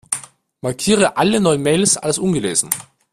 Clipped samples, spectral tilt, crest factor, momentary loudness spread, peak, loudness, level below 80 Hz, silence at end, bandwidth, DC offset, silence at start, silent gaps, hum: under 0.1%; -3.5 dB/octave; 18 dB; 10 LU; 0 dBFS; -17 LUFS; -52 dBFS; 0.3 s; 15.5 kHz; under 0.1%; 0.1 s; none; none